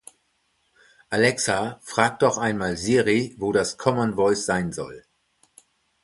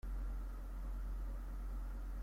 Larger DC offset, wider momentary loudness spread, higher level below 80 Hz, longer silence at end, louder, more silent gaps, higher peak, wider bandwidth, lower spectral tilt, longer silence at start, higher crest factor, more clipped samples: neither; first, 7 LU vs 2 LU; second, -54 dBFS vs -42 dBFS; first, 1.05 s vs 0 s; first, -23 LUFS vs -48 LUFS; neither; first, -2 dBFS vs -34 dBFS; second, 11.5 kHz vs 15 kHz; second, -4.5 dB/octave vs -7 dB/octave; first, 1.1 s vs 0.05 s; first, 22 dB vs 8 dB; neither